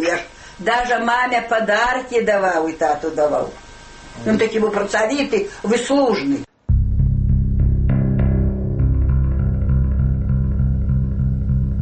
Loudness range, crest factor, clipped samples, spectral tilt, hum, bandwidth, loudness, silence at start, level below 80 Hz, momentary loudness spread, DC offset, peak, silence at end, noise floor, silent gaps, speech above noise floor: 1 LU; 12 dB; under 0.1%; -6.5 dB/octave; none; 8.8 kHz; -19 LUFS; 0 s; -22 dBFS; 4 LU; under 0.1%; -6 dBFS; 0 s; -39 dBFS; none; 21 dB